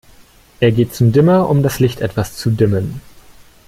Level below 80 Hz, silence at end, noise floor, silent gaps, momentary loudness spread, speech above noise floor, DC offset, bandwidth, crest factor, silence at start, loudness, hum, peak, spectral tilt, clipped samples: -42 dBFS; 0.65 s; -45 dBFS; none; 9 LU; 32 dB; under 0.1%; 16 kHz; 14 dB; 0.6 s; -15 LUFS; none; -2 dBFS; -7 dB/octave; under 0.1%